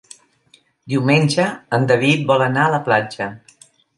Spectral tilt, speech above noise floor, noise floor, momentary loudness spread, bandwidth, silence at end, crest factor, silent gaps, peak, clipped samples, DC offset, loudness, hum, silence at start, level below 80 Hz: -6 dB/octave; 39 dB; -56 dBFS; 10 LU; 11.5 kHz; 0.6 s; 16 dB; none; -2 dBFS; under 0.1%; under 0.1%; -17 LUFS; none; 0.85 s; -62 dBFS